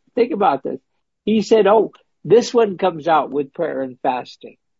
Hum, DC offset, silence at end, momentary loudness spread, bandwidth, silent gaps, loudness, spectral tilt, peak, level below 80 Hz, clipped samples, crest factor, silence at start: none; under 0.1%; 0.3 s; 14 LU; 7.8 kHz; none; -18 LUFS; -5.5 dB/octave; -2 dBFS; -66 dBFS; under 0.1%; 16 dB; 0.15 s